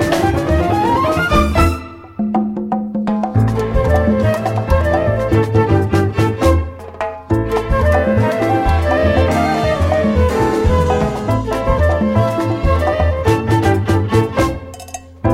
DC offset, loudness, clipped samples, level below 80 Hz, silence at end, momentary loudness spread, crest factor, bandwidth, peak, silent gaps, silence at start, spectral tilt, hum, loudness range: under 0.1%; -15 LUFS; under 0.1%; -24 dBFS; 0 s; 6 LU; 14 dB; 15.5 kHz; -2 dBFS; none; 0 s; -7 dB/octave; none; 2 LU